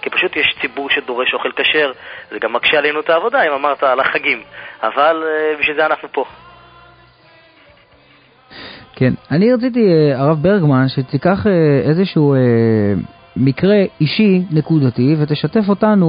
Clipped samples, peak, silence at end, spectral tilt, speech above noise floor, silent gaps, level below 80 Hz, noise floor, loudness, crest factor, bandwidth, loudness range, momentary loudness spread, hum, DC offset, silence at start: under 0.1%; 0 dBFS; 0 s; -12 dB/octave; 34 dB; none; -48 dBFS; -48 dBFS; -14 LUFS; 14 dB; 5.2 kHz; 7 LU; 9 LU; none; under 0.1%; 0.05 s